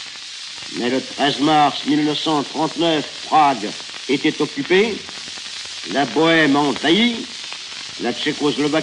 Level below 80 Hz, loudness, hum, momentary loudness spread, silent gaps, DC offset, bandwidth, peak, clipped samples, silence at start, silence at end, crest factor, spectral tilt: -62 dBFS; -19 LUFS; none; 13 LU; none; under 0.1%; 11 kHz; -4 dBFS; under 0.1%; 0 s; 0 s; 16 dB; -4 dB/octave